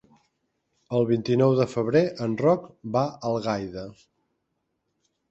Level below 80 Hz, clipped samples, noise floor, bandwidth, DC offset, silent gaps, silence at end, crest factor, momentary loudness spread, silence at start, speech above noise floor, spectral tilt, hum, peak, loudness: -62 dBFS; under 0.1%; -77 dBFS; 8.2 kHz; under 0.1%; none; 1.4 s; 18 dB; 9 LU; 0.9 s; 53 dB; -7.5 dB/octave; none; -8 dBFS; -24 LUFS